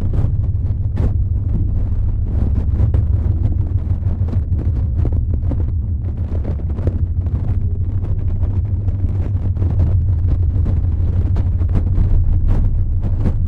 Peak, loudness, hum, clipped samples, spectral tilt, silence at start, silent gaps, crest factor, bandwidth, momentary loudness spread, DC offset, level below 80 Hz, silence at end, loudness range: -2 dBFS; -19 LUFS; none; under 0.1%; -11 dB/octave; 0 s; none; 14 dB; 2.7 kHz; 4 LU; under 0.1%; -20 dBFS; 0 s; 3 LU